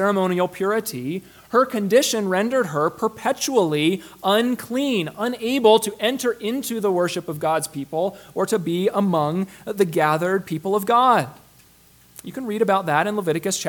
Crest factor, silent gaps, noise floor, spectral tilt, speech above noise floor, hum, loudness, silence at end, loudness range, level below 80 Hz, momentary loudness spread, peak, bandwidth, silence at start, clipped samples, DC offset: 20 dB; none; -53 dBFS; -4.5 dB/octave; 32 dB; none; -21 LUFS; 0 s; 2 LU; -64 dBFS; 9 LU; -2 dBFS; 19 kHz; 0 s; under 0.1%; under 0.1%